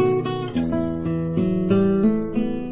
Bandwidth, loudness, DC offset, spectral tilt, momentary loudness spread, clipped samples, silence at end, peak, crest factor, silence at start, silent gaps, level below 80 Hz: 4 kHz; -22 LUFS; under 0.1%; -12.5 dB/octave; 6 LU; under 0.1%; 0 s; -6 dBFS; 14 dB; 0 s; none; -44 dBFS